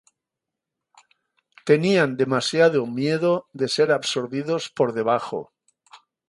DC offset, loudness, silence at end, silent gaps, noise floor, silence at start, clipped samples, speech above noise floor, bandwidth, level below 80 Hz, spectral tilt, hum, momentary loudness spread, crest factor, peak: under 0.1%; -22 LUFS; 0.35 s; none; -85 dBFS; 1.65 s; under 0.1%; 64 dB; 11.5 kHz; -70 dBFS; -5 dB/octave; none; 8 LU; 20 dB; -4 dBFS